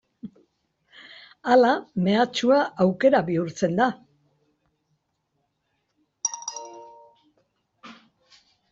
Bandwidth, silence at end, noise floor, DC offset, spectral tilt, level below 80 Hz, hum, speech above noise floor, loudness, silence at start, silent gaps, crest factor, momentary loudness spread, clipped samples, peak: 7.8 kHz; 0.8 s; -75 dBFS; under 0.1%; -4.5 dB/octave; -68 dBFS; none; 54 dB; -22 LUFS; 0.25 s; none; 20 dB; 25 LU; under 0.1%; -6 dBFS